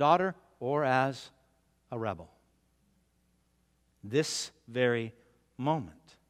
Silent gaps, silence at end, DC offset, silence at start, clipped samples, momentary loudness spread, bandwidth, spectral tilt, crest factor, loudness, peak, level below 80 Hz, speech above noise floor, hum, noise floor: none; 0.4 s; under 0.1%; 0 s; under 0.1%; 16 LU; 16 kHz; -5 dB/octave; 24 dB; -32 LUFS; -10 dBFS; -72 dBFS; 41 dB; none; -72 dBFS